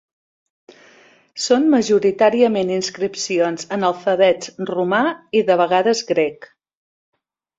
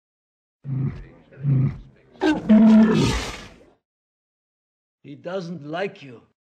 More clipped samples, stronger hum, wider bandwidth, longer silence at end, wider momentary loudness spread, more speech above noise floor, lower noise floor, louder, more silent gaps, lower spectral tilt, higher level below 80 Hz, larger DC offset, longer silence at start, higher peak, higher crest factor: neither; neither; second, 8 kHz vs 9.6 kHz; first, 1.15 s vs 0.25 s; second, 9 LU vs 24 LU; first, 33 dB vs 24 dB; first, -51 dBFS vs -44 dBFS; about the same, -18 LUFS vs -20 LUFS; second, none vs 3.85-4.98 s; second, -4 dB/octave vs -7 dB/octave; second, -64 dBFS vs -42 dBFS; neither; first, 1.35 s vs 0.65 s; about the same, -2 dBFS vs -4 dBFS; about the same, 18 dB vs 18 dB